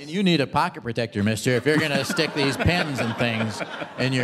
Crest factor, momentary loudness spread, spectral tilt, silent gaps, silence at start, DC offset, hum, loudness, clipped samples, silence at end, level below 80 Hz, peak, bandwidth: 18 dB; 7 LU; -5 dB/octave; none; 0 s; under 0.1%; none; -23 LUFS; under 0.1%; 0 s; -48 dBFS; -6 dBFS; 15.5 kHz